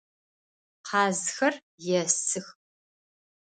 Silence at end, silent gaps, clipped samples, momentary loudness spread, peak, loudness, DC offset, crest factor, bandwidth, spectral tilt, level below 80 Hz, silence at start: 0.9 s; 1.62-1.78 s; under 0.1%; 10 LU; -8 dBFS; -27 LUFS; under 0.1%; 24 dB; 9.6 kHz; -2.5 dB/octave; -78 dBFS; 0.85 s